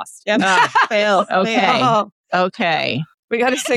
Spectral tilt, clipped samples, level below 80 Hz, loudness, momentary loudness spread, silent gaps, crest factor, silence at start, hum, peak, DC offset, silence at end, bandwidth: -4 dB/octave; under 0.1%; -66 dBFS; -16 LUFS; 8 LU; 2.12-2.24 s, 3.14-3.28 s; 12 dB; 0 s; none; -4 dBFS; under 0.1%; 0 s; 14 kHz